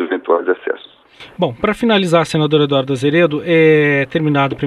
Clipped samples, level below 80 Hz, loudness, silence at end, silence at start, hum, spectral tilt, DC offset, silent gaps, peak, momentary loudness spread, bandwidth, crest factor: under 0.1%; -50 dBFS; -14 LUFS; 0 s; 0 s; none; -6.5 dB/octave; under 0.1%; none; 0 dBFS; 10 LU; 12 kHz; 14 dB